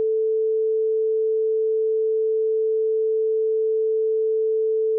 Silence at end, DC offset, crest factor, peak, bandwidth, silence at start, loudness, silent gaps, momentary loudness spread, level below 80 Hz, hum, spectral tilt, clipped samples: 0 s; under 0.1%; 4 dB; -18 dBFS; 0.5 kHz; 0 s; -22 LUFS; none; 0 LU; under -90 dBFS; none; 1.5 dB/octave; under 0.1%